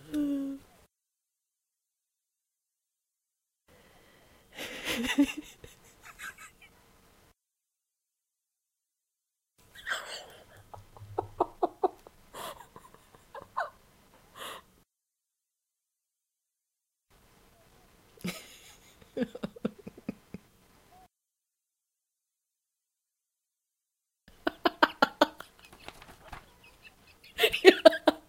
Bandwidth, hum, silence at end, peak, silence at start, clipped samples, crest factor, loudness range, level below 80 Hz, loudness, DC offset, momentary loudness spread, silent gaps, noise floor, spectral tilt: 16 kHz; none; 0.1 s; -2 dBFS; 0.1 s; under 0.1%; 32 dB; 19 LU; -64 dBFS; -29 LUFS; under 0.1%; 25 LU; none; -87 dBFS; -3.5 dB/octave